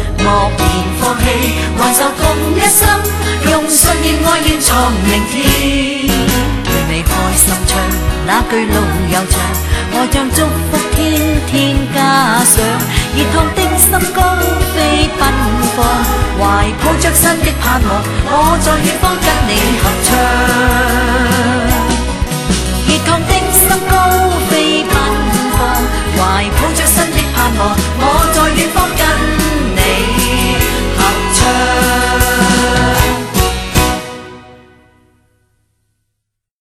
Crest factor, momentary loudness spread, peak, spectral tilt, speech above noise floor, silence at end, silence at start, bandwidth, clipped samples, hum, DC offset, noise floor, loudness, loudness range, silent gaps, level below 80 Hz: 12 dB; 5 LU; 0 dBFS; -3.5 dB/octave; 62 dB; 2.05 s; 0 s; over 20 kHz; under 0.1%; none; under 0.1%; -73 dBFS; -11 LUFS; 2 LU; none; -18 dBFS